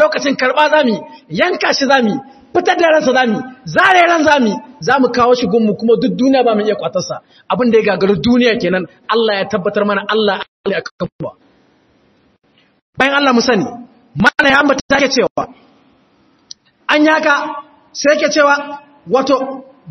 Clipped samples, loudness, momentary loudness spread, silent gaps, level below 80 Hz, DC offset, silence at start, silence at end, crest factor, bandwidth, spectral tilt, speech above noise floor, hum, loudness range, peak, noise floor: under 0.1%; -13 LUFS; 14 LU; 10.48-10.64 s, 10.91-10.99 s, 11.12-11.19 s, 12.82-12.93 s, 14.81-14.89 s, 15.30-15.36 s; -50 dBFS; under 0.1%; 0 s; 0 s; 14 dB; 9.6 kHz; -4.5 dB/octave; 41 dB; none; 6 LU; 0 dBFS; -54 dBFS